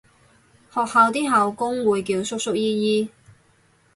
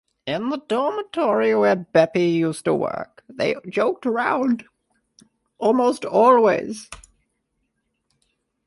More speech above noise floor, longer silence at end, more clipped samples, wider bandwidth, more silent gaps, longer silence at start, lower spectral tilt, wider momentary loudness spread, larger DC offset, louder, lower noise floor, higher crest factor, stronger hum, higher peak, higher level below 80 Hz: second, 39 dB vs 54 dB; second, 0.9 s vs 1.7 s; neither; about the same, 11.5 kHz vs 11.5 kHz; neither; first, 0.75 s vs 0.25 s; second, -4.5 dB/octave vs -6 dB/octave; second, 8 LU vs 11 LU; neither; about the same, -21 LUFS vs -20 LUFS; second, -59 dBFS vs -73 dBFS; about the same, 18 dB vs 18 dB; neither; about the same, -4 dBFS vs -4 dBFS; about the same, -64 dBFS vs -62 dBFS